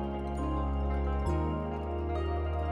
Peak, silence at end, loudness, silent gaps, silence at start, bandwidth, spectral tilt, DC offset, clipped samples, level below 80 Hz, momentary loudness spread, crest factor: -20 dBFS; 0 s; -33 LUFS; none; 0 s; 7.8 kHz; -8.5 dB/octave; under 0.1%; under 0.1%; -34 dBFS; 3 LU; 10 dB